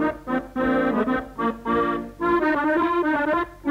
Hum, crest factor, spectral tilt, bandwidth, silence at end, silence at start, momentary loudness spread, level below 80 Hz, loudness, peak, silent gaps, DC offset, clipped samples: none; 12 dB; -7 dB/octave; 15 kHz; 0 s; 0 s; 6 LU; -46 dBFS; -23 LUFS; -10 dBFS; none; under 0.1%; under 0.1%